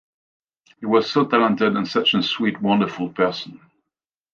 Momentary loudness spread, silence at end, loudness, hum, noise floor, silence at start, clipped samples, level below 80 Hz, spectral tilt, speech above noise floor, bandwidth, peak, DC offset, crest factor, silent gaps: 8 LU; 0.8 s; -20 LUFS; none; -85 dBFS; 0.8 s; under 0.1%; -64 dBFS; -6 dB/octave; 65 dB; 7 kHz; -2 dBFS; under 0.1%; 20 dB; none